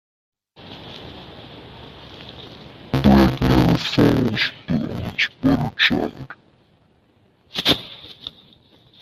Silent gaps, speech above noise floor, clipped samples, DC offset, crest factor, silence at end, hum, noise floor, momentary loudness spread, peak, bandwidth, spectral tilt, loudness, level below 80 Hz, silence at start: none; 38 dB; under 0.1%; under 0.1%; 20 dB; 0.7 s; none; -58 dBFS; 24 LU; -2 dBFS; 15 kHz; -6 dB/octave; -19 LUFS; -36 dBFS; 0.6 s